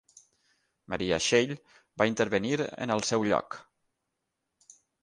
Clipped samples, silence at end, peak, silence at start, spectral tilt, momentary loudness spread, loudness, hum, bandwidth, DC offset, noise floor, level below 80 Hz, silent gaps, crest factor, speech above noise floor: under 0.1%; 1.4 s; -8 dBFS; 0.9 s; -4 dB/octave; 18 LU; -28 LUFS; none; 10.5 kHz; under 0.1%; -83 dBFS; -62 dBFS; none; 24 dB; 55 dB